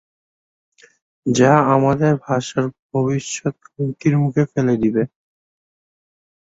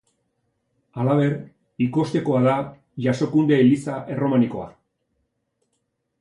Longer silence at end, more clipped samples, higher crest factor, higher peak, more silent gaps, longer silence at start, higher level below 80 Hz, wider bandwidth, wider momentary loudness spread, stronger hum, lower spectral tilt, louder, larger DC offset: about the same, 1.4 s vs 1.5 s; neither; about the same, 18 dB vs 18 dB; first, -2 dBFS vs -6 dBFS; first, 2.79-2.89 s vs none; first, 1.25 s vs 0.95 s; first, -54 dBFS vs -62 dBFS; second, 8 kHz vs 11 kHz; second, 12 LU vs 15 LU; neither; second, -6.5 dB/octave vs -8 dB/octave; first, -18 LUFS vs -21 LUFS; neither